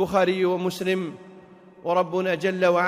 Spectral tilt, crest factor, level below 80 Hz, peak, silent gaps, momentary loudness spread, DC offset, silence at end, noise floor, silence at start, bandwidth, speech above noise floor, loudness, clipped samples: -6 dB/octave; 14 dB; -62 dBFS; -10 dBFS; none; 13 LU; under 0.1%; 0 s; -48 dBFS; 0 s; 15.5 kHz; 25 dB; -24 LUFS; under 0.1%